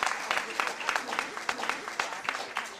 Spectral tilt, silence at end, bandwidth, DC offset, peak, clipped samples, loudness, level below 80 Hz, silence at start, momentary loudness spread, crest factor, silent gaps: -0.5 dB/octave; 0 s; 15.5 kHz; under 0.1%; -10 dBFS; under 0.1%; -31 LUFS; -72 dBFS; 0 s; 4 LU; 22 dB; none